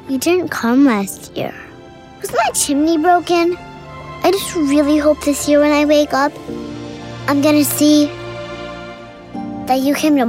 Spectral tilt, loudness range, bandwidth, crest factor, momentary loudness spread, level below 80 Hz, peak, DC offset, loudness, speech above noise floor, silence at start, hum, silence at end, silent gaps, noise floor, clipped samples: -4 dB/octave; 3 LU; 16 kHz; 12 dB; 17 LU; -46 dBFS; -2 dBFS; under 0.1%; -15 LUFS; 24 dB; 0 s; none; 0 s; none; -38 dBFS; under 0.1%